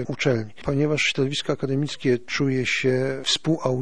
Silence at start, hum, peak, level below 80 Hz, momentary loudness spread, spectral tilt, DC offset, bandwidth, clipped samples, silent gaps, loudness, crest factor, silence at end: 0 s; none; -6 dBFS; -54 dBFS; 4 LU; -5 dB/octave; 1%; 10.5 kHz; under 0.1%; none; -23 LUFS; 16 dB; 0 s